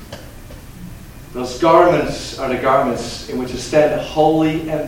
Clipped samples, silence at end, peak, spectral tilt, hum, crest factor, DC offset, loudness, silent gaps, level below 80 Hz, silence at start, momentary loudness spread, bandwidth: under 0.1%; 0 s; 0 dBFS; -5.5 dB/octave; none; 18 dB; under 0.1%; -17 LUFS; none; -38 dBFS; 0 s; 24 LU; 17 kHz